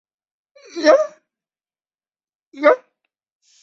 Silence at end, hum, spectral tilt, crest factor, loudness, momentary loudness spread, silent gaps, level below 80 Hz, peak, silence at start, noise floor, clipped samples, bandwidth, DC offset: 0.85 s; none; -2 dB/octave; 20 dB; -17 LUFS; 12 LU; 2.35-2.52 s; -74 dBFS; -2 dBFS; 0.75 s; under -90 dBFS; under 0.1%; 7.4 kHz; under 0.1%